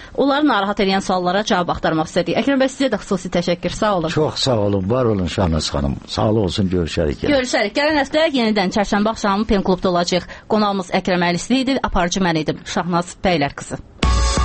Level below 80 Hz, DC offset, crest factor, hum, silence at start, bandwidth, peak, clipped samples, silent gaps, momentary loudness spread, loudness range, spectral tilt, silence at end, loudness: -30 dBFS; under 0.1%; 18 dB; none; 0 s; 8.8 kHz; 0 dBFS; under 0.1%; none; 4 LU; 1 LU; -5 dB/octave; 0 s; -18 LUFS